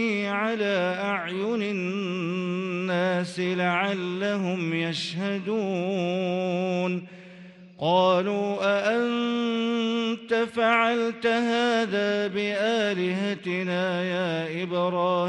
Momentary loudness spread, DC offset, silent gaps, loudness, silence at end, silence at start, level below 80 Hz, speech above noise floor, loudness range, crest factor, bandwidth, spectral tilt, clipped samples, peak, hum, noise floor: 6 LU; under 0.1%; none; -26 LUFS; 0 s; 0 s; -72 dBFS; 21 dB; 3 LU; 16 dB; 11 kHz; -6 dB/octave; under 0.1%; -8 dBFS; none; -47 dBFS